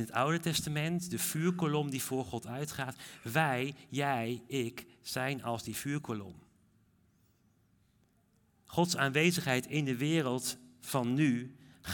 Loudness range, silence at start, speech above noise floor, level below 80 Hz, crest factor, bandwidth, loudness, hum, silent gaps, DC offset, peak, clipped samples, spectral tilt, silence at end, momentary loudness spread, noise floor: 9 LU; 0 s; 37 dB; -70 dBFS; 20 dB; 18 kHz; -33 LUFS; none; none; under 0.1%; -14 dBFS; under 0.1%; -4.5 dB/octave; 0 s; 11 LU; -71 dBFS